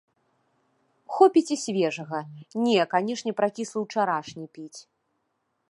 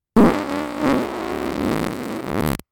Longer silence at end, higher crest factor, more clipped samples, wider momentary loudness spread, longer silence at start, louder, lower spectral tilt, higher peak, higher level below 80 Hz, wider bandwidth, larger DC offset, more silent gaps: first, 0.9 s vs 0.15 s; about the same, 22 dB vs 18 dB; neither; first, 21 LU vs 10 LU; first, 1.1 s vs 0.15 s; second, -25 LUFS vs -21 LUFS; second, -4.5 dB/octave vs -6.5 dB/octave; about the same, -4 dBFS vs -2 dBFS; second, -78 dBFS vs -40 dBFS; second, 11.5 kHz vs 19.5 kHz; neither; neither